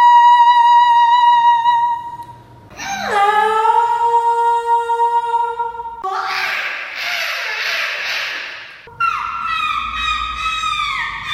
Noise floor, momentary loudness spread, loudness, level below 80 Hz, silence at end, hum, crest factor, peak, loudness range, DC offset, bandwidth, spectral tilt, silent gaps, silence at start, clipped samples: -39 dBFS; 14 LU; -15 LUFS; -46 dBFS; 0 s; none; 14 dB; -2 dBFS; 6 LU; under 0.1%; 15 kHz; -1 dB/octave; none; 0 s; under 0.1%